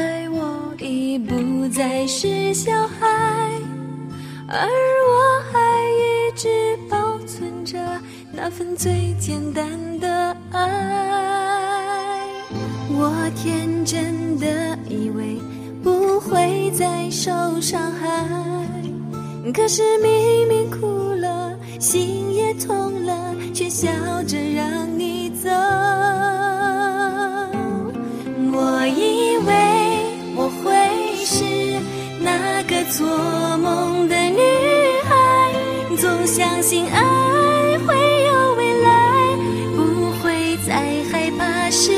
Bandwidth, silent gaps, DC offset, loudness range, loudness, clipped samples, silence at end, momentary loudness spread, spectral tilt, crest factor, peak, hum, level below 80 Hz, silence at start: 15.5 kHz; none; under 0.1%; 6 LU; -19 LUFS; under 0.1%; 0 s; 11 LU; -4 dB/octave; 16 dB; -4 dBFS; none; -54 dBFS; 0 s